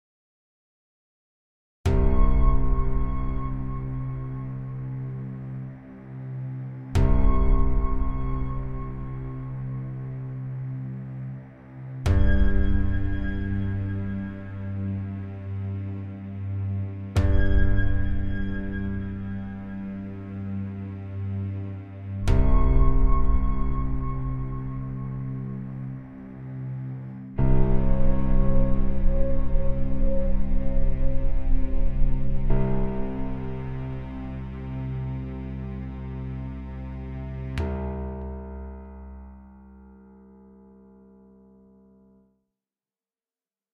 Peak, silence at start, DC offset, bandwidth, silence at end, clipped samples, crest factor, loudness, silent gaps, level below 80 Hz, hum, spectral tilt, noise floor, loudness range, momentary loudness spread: -6 dBFS; 1.85 s; under 0.1%; 4.3 kHz; 4.3 s; under 0.1%; 16 dB; -29 LUFS; none; -26 dBFS; none; -9 dB/octave; under -90 dBFS; 7 LU; 12 LU